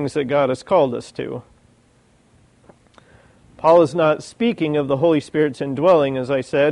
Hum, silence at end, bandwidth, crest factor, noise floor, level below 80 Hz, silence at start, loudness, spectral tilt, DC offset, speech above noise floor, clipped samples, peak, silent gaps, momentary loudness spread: none; 0 s; 11 kHz; 16 dB; -56 dBFS; -58 dBFS; 0 s; -18 LUFS; -6.5 dB/octave; under 0.1%; 38 dB; under 0.1%; -2 dBFS; none; 11 LU